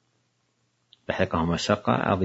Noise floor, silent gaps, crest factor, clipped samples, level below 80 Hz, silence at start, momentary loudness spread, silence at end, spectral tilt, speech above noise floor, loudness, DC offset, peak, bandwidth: -71 dBFS; none; 22 dB; under 0.1%; -54 dBFS; 1.1 s; 9 LU; 0 s; -5.5 dB/octave; 47 dB; -25 LUFS; under 0.1%; -4 dBFS; 8 kHz